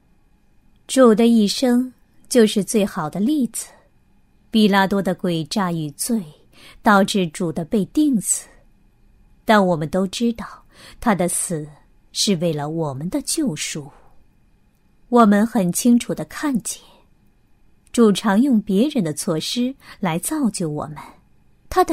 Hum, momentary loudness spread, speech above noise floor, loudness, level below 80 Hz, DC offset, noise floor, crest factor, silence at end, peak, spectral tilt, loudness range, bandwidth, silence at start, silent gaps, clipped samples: none; 12 LU; 38 dB; -19 LUFS; -50 dBFS; under 0.1%; -56 dBFS; 20 dB; 0 s; 0 dBFS; -4.5 dB/octave; 4 LU; 16 kHz; 0.9 s; none; under 0.1%